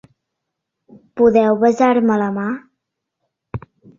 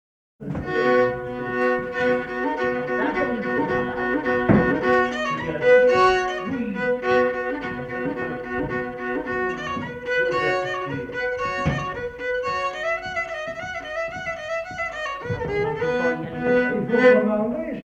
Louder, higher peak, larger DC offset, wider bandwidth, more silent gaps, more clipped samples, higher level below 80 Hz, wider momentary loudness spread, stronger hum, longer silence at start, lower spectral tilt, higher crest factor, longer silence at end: first, -15 LUFS vs -23 LUFS; about the same, -2 dBFS vs -2 dBFS; neither; second, 7.4 kHz vs 8.2 kHz; neither; neither; about the same, -52 dBFS vs -48 dBFS; first, 20 LU vs 11 LU; neither; first, 1.15 s vs 0.4 s; about the same, -7.5 dB/octave vs -6.5 dB/octave; about the same, 18 dB vs 20 dB; first, 0.4 s vs 0.05 s